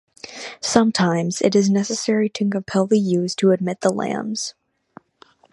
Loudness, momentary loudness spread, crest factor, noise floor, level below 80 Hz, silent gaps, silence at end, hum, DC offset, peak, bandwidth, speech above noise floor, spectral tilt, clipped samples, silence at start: -20 LUFS; 10 LU; 20 dB; -54 dBFS; -62 dBFS; none; 1 s; none; under 0.1%; 0 dBFS; 11.5 kHz; 35 dB; -5 dB/octave; under 0.1%; 0.25 s